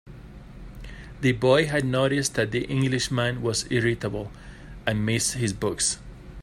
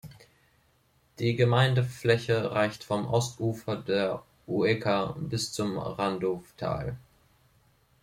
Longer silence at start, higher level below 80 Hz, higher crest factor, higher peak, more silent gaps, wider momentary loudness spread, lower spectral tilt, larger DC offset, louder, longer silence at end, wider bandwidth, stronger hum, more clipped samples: about the same, 0.05 s vs 0.05 s; first, -46 dBFS vs -58 dBFS; about the same, 18 dB vs 22 dB; about the same, -8 dBFS vs -8 dBFS; neither; first, 23 LU vs 10 LU; about the same, -4.5 dB/octave vs -5.5 dB/octave; neither; first, -25 LUFS vs -29 LUFS; second, 0 s vs 1.05 s; about the same, 15.5 kHz vs 15.5 kHz; neither; neither